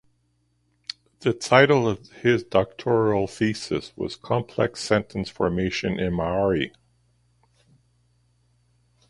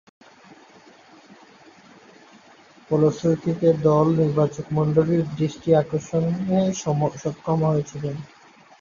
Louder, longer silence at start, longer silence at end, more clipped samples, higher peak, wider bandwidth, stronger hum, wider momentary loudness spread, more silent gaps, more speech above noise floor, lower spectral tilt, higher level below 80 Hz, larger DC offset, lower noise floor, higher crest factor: about the same, -23 LUFS vs -22 LUFS; second, 1.2 s vs 2.9 s; first, 2.4 s vs 0.55 s; neither; first, 0 dBFS vs -6 dBFS; first, 11.5 kHz vs 7.4 kHz; first, 60 Hz at -50 dBFS vs none; first, 13 LU vs 7 LU; neither; first, 46 dB vs 30 dB; second, -5.5 dB/octave vs -8 dB/octave; first, -50 dBFS vs -56 dBFS; neither; first, -68 dBFS vs -51 dBFS; first, 24 dB vs 18 dB